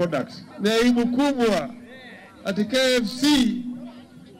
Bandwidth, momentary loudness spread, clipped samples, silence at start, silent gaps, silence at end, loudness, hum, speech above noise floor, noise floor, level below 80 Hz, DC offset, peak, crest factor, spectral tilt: 16 kHz; 22 LU; under 0.1%; 0 s; none; 0 s; -22 LUFS; none; 23 dB; -44 dBFS; -52 dBFS; under 0.1%; -8 dBFS; 14 dB; -4.5 dB/octave